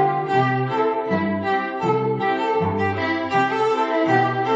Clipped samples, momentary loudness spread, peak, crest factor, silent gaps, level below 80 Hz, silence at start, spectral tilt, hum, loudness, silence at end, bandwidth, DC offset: under 0.1%; 4 LU; -6 dBFS; 14 dB; none; -64 dBFS; 0 s; -7 dB/octave; none; -21 LUFS; 0 s; 8 kHz; under 0.1%